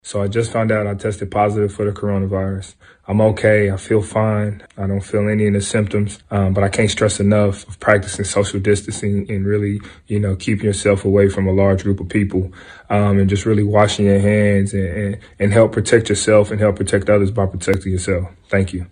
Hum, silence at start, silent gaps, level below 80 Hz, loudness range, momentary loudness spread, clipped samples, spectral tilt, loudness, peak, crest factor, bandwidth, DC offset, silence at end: none; 0.05 s; none; -42 dBFS; 3 LU; 8 LU; under 0.1%; -6 dB/octave; -17 LUFS; 0 dBFS; 16 dB; 10 kHz; under 0.1%; 0.05 s